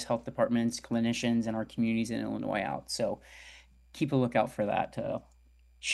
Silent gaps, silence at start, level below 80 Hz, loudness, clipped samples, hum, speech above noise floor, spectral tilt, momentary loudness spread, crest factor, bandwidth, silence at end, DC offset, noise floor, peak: none; 0 s; -60 dBFS; -31 LUFS; under 0.1%; none; 30 dB; -5 dB/octave; 11 LU; 20 dB; 12.5 kHz; 0 s; under 0.1%; -61 dBFS; -12 dBFS